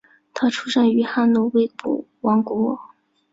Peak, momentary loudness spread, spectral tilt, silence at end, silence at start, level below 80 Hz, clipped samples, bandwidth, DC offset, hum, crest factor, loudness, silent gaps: -6 dBFS; 9 LU; -5.5 dB/octave; 0.5 s; 0.35 s; -66 dBFS; under 0.1%; 7.8 kHz; under 0.1%; none; 14 dB; -20 LUFS; none